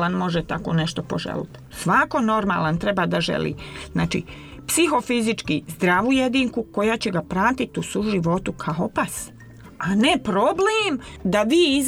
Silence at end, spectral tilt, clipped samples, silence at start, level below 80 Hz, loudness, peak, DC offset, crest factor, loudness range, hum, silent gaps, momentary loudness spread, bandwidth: 0 s; -4.5 dB/octave; under 0.1%; 0 s; -46 dBFS; -22 LUFS; -6 dBFS; under 0.1%; 16 dB; 2 LU; none; none; 10 LU; 18.5 kHz